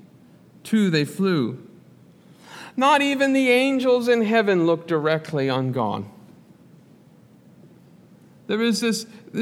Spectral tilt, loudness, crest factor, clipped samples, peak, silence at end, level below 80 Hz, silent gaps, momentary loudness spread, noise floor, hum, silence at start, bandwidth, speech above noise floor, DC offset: -5.5 dB/octave; -21 LUFS; 16 dB; under 0.1%; -6 dBFS; 0 s; -74 dBFS; none; 14 LU; -51 dBFS; none; 0.65 s; 16 kHz; 31 dB; under 0.1%